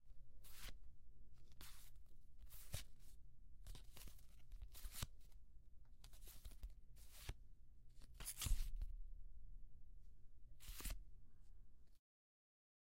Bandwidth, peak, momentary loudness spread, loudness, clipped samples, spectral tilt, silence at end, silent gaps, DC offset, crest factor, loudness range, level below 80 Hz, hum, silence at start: 16 kHz; -28 dBFS; 18 LU; -56 LUFS; under 0.1%; -2.5 dB/octave; 1 s; none; under 0.1%; 24 dB; 7 LU; -56 dBFS; none; 0 s